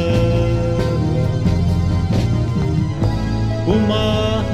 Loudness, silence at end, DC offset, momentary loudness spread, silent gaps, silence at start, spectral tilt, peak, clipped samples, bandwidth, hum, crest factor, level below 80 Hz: -18 LUFS; 0 s; under 0.1%; 3 LU; none; 0 s; -7.5 dB/octave; -2 dBFS; under 0.1%; 10.5 kHz; none; 14 dB; -26 dBFS